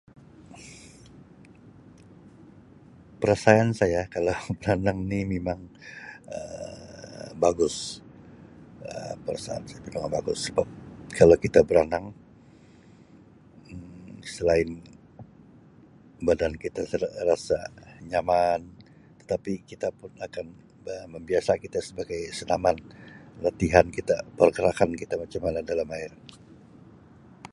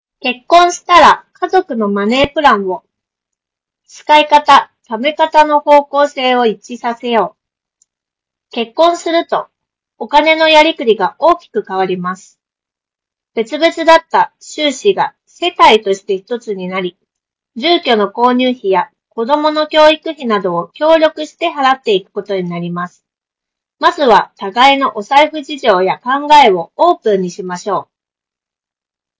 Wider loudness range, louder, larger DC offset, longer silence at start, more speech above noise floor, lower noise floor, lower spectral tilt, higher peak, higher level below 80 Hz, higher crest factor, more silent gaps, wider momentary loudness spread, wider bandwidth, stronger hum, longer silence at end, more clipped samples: first, 8 LU vs 5 LU; second, -26 LUFS vs -12 LUFS; neither; first, 0.5 s vs 0.25 s; second, 28 dB vs 76 dB; second, -53 dBFS vs -87 dBFS; first, -5.5 dB/octave vs -4 dB/octave; about the same, -2 dBFS vs 0 dBFS; about the same, -48 dBFS vs -50 dBFS; first, 26 dB vs 12 dB; neither; first, 23 LU vs 13 LU; first, 11.5 kHz vs 8 kHz; neither; about the same, 1.45 s vs 1.35 s; second, under 0.1% vs 1%